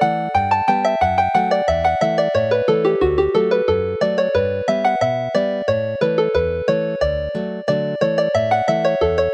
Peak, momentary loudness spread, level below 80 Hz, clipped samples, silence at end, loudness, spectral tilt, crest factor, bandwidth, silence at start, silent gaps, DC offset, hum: -4 dBFS; 4 LU; -38 dBFS; under 0.1%; 0 s; -18 LUFS; -6.5 dB/octave; 14 dB; 11 kHz; 0 s; none; under 0.1%; none